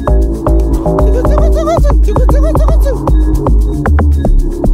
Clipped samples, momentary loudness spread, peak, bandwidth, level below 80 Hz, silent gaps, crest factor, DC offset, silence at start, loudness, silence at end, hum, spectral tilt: under 0.1%; 2 LU; 0 dBFS; 9.8 kHz; -10 dBFS; none; 8 dB; under 0.1%; 0 s; -11 LUFS; 0 s; none; -8.5 dB/octave